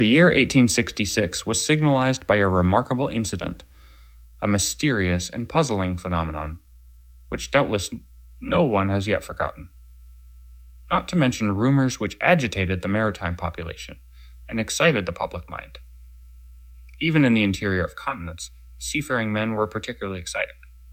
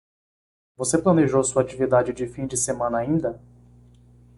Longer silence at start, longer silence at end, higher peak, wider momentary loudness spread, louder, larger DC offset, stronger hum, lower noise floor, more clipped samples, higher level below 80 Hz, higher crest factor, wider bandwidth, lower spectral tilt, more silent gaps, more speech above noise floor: second, 0 s vs 0.8 s; second, 0 s vs 1 s; about the same, -4 dBFS vs -6 dBFS; first, 15 LU vs 10 LU; about the same, -23 LUFS vs -22 LUFS; neither; second, none vs 60 Hz at -45 dBFS; second, -48 dBFS vs -52 dBFS; neither; first, -44 dBFS vs -52 dBFS; about the same, 20 dB vs 18 dB; first, 16.5 kHz vs 11.5 kHz; about the same, -5 dB/octave vs -5.5 dB/octave; neither; second, 26 dB vs 30 dB